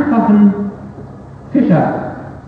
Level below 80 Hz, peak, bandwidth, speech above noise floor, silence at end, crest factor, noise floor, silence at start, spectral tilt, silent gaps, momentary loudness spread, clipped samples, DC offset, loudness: -44 dBFS; 0 dBFS; 4.4 kHz; 21 dB; 0 s; 14 dB; -32 dBFS; 0 s; -10.5 dB/octave; none; 22 LU; under 0.1%; under 0.1%; -13 LUFS